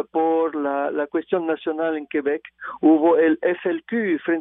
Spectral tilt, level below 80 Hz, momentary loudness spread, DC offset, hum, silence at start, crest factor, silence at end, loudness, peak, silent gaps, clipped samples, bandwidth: -4.5 dB/octave; -72 dBFS; 9 LU; under 0.1%; none; 0 s; 14 dB; 0 s; -21 LUFS; -6 dBFS; none; under 0.1%; 3.9 kHz